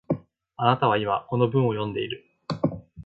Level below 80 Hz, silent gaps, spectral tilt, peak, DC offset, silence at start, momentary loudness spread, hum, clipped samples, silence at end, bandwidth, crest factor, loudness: -56 dBFS; none; -8.5 dB/octave; -4 dBFS; under 0.1%; 0.1 s; 10 LU; none; under 0.1%; 0 s; 7.4 kHz; 22 dB; -25 LUFS